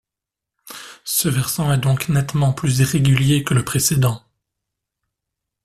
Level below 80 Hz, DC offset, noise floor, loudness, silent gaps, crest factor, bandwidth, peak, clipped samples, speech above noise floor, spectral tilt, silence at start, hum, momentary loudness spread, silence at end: -46 dBFS; under 0.1%; -86 dBFS; -18 LUFS; none; 16 dB; 15 kHz; -4 dBFS; under 0.1%; 68 dB; -5 dB/octave; 0.65 s; none; 16 LU; 1.45 s